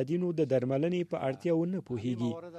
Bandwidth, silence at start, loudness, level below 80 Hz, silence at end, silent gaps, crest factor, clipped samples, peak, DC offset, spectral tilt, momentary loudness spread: 9.4 kHz; 0 s; -31 LUFS; -70 dBFS; 0 s; none; 14 dB; under 0.1%; -16 dBFS; under 0.1%; -8.5 dB/octave; 6 LU